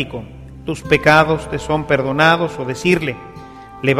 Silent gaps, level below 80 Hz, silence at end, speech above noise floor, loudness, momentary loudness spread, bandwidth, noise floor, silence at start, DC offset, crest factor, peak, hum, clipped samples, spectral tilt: none; -40 dBFS; 0 s; 20 dB; -16 LUFS; 22 LU; 15.5 kHz; -36 dBFS; 0 s; under 0.1%; 18 dB; 0 dBFS; none; under 0.1%; -5.5 dB/octave